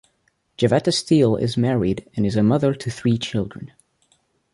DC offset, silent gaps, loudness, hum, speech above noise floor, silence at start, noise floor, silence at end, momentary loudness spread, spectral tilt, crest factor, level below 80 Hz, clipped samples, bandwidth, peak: under 0.1%; none; -20 LUFS; none; 48 dB; 0.6 s; -67 dBFS; 0.85 s; 9 LU; -6.5 dB/octave; 18 dB; -50 dBFS; under 0.1%; 11.5 kHz; -4 dBFS